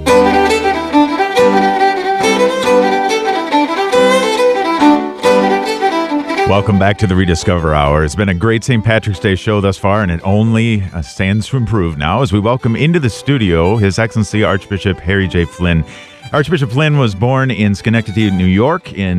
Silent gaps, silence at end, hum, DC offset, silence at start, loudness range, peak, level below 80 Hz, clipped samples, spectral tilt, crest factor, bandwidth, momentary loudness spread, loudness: none; 0 s; none; under 0.1%; 0 s; 3 LU; 0 dBFS; -32 dBFS; under 0.1%; -6 dB/octave; 12 dB; 14 kHz; 5 LU; -13 LUFS